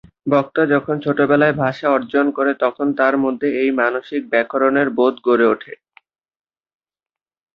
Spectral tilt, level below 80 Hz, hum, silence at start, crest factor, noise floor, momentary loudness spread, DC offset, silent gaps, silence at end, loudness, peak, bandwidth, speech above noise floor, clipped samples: -8.5 dB/octave; -62 dBFS; none; 0.25 s; 18 dB; under -90 dBFS; 4 LU; under 0.1%; none; 1.8 s; -17 LUFS; -2 dBFS; 5.8 kHz; over 73 dB; under 0.1%